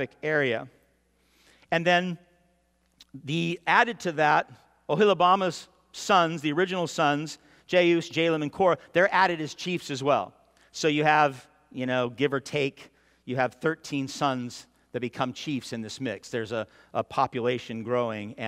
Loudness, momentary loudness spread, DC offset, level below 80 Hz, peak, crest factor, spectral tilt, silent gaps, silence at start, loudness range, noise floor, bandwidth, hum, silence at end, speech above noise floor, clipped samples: -26 LUFS; 14 LU; under 0.1%; -68 dBFS; -6 dBFS; 22 dB; -5 dB/octave; none; 0 s; 7 LU; -68 dBFS; 15.5 kHz; none; 0 s; 42 dB; under 0.1%